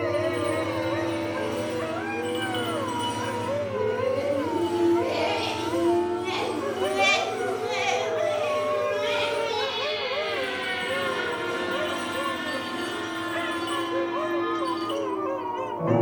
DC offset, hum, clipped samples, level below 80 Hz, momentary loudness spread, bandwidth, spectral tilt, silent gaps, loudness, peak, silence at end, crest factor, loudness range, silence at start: under 0.1%; none; under 0.1%; -66 dBFS; 5 LU; 18 kHz; -4.5 dB/octave; none; -27 LUFS; -10 dBFS; 0 s; 16 dB; 3 LU; 0 s